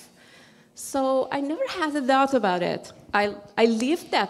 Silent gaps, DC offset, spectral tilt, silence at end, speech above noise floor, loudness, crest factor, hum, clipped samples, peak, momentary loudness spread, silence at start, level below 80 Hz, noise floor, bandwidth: none; under 0.1%; -4 dB/octave; 0 s; 29 dB; -24 LUFS; 18 dB; none; under 0.1%; -8 dBFS; 8 LU; 0 s; -64 dBFS; -53 dBFS; 15 kHz